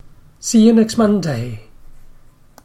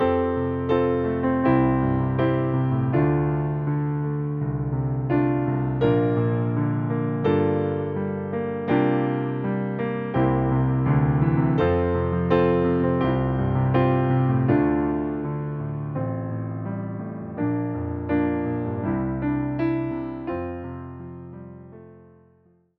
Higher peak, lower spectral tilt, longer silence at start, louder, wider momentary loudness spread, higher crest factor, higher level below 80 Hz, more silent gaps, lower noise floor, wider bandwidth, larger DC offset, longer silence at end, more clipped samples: first, -2 dBFS vs -6 dBFS; second, -5.5 dB/octave vs -8.5 dB/octave; first, 0.45 s vs 0 s; first, -15 LUFS vs -23 LUFS; first, 17 LU vs 10 LU; about the same, 16 dB vs 16 dB; about the same, -42 dBFS vs -42 dBFS; neither; second, -44 dBFS vs -59 dBFS; first, 14 kHz vs 4.6 kHz; neither; second, 0.6 s vs 0.8 s; neither